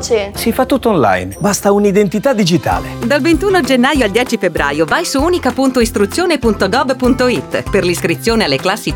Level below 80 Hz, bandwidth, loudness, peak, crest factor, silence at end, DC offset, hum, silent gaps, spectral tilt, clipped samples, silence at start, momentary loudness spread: -32 dBFS; over 20 kHz; -13 LUFS; 0 dBFS; 12 dB; 0 s; under 0.1%; none; none; -4.5 dB/octave; under 0.1%; 0 s; 4 LU